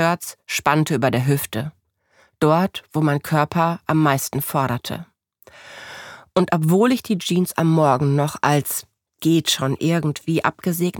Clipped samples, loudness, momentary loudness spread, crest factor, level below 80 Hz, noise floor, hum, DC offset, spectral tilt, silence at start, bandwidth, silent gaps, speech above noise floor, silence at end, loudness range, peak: under 0.1%; -20 LUFS; 11 LU; 18 dB; -58 dBFS; -59 dBFS; none; under 0.1%; -5.5 dB/octave; 0 s; 19 kHz; none; 40 dB; 0 s; 3 LU; -2 dBFS